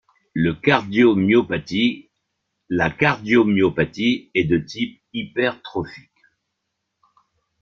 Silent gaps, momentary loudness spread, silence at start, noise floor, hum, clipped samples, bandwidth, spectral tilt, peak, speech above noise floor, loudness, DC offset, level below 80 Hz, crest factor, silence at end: none; 13 LU; 0.35 s; -77 dBFS; none; under 0.1%; 7 kHz; -7 dB/octave; -2 dBFS; 58 dB; -20 LUFS; under 0.1%; -52 dBFS; 18 dB; 1.65 s